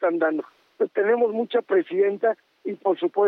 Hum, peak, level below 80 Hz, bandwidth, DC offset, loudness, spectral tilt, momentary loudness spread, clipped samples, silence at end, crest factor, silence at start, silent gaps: none; -10 dBFS; -88 dBFS; 4.4 kHz; under 0.1%; -24 LUFS; -8 dB/octave; 11 LU; under 0.1%; 0 s; 12 dB; 0 s; none